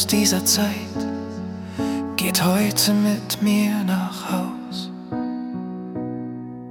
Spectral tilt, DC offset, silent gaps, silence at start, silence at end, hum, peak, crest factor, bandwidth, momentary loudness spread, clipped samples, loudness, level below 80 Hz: -4 dB/octave; under 0.1%; none; 0 s; 0 s; none; -4 dBFS; 20 dB; 18 kHz; 13 LU; under 0.1%; -22 LUFS; -58 dBFS